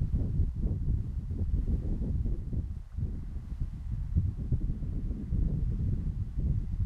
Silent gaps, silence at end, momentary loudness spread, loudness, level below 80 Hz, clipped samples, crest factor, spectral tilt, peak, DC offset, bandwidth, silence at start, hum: none; 0 s; 6 LU; -34 LUFS; -32 dBFS; under 0.1%; 16 dB; -11 dB/octave; -14 dBFS; under 0.1%; 2.9 kHz; 0 s; none